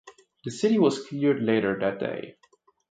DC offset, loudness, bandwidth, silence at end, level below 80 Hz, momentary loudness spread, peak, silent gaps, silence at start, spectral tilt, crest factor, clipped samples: under 0.1%; -25 LUFS; 9.2 kHz; 0.6 s; -66 dBFS; 16 LU; -10 dBFS; none; 0.05 s; -6 dB/octave; 16 dB; under 0.1%